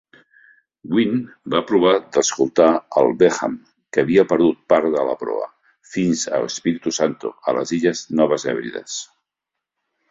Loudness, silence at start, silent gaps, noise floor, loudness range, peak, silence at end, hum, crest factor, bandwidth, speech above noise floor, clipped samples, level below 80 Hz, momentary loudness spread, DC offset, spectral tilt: -19 LUFS; 0.85 s; none; -83 dBFS; 5 LU; -2 dBFS; 1.05 s; none; 18 dB; 7.8 kHz; 65 dB; under 0.1%; -60 dBFS; 11 LU; under 0.1%; -4.5 dB/octave